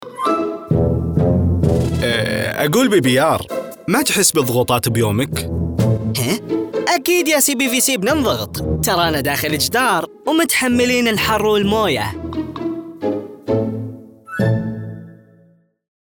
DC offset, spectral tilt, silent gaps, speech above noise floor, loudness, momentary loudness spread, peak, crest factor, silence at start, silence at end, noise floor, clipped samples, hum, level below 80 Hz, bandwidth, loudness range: under 0.1%; -4.5 dB/octave; none; 37 dB; -17 LUFS; 11 LU; -2 dBFS; 16 dB; 0 s; 0.95 s; -53 dBFS; under 0.1%; none; -40 dBFS; over 20 kHz; 5 LU